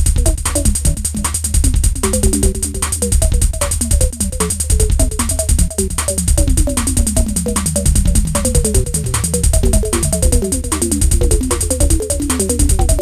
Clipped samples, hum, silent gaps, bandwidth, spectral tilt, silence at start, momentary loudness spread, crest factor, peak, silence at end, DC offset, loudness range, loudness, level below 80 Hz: under 0.1%; none; none; 15.5 kHz; -4.5 dB/octave; 0 s; 3 LU; 12 dB; -2 dBFS; 0 s; 0.8%; 1 LU; -15 LUFS; -16 dBFS